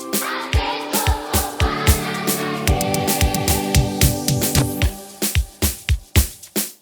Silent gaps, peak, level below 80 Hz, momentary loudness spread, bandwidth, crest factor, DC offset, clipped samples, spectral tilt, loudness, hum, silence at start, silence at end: none; 0 dBFS; -26 dBFS; 5 LU; over 20 kHz; 20 dB; under 0.1%; under 0.1%; -4 dB/octave; -19 LUFS; none; 0 s; 0.1 s